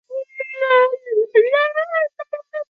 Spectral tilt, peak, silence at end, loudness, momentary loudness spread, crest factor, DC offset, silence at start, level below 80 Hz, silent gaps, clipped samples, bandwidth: -3 dB/octave; -2 dBFS; 0.05 s; -18 LUFS; 14 LU; 16 dB; under 0.1%; 0.1 s; -76 dBFS; none; under 0.1%; 5 kHz